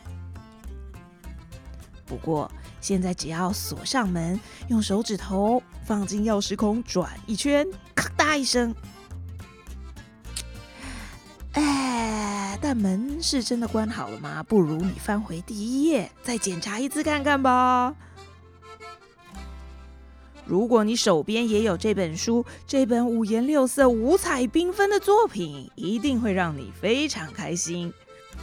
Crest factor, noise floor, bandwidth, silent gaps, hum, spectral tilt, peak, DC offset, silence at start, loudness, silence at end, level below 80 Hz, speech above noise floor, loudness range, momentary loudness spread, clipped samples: 22 dB; -47 dBFS; 17.5 kHz; none; none; -4.5 dB/octave; -4 dBFS; under 0.1%; 0.05 s; -24 LUFS; 0 s; -46 dBFS; 23 dB; 7 LU; 22 LU; under 0.1%